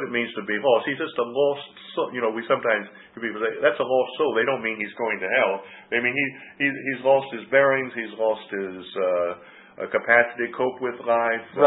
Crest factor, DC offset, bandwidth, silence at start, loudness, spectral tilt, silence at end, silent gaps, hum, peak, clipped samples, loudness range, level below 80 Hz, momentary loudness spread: 20 dB; under 0.1%; 4.1 kHz; 0 s; -24 LUFS; -9 dB/octave; 0 s; none; none; -4 dBFS; under 0.1%; 2 LU; -72 dBFS; 11 LU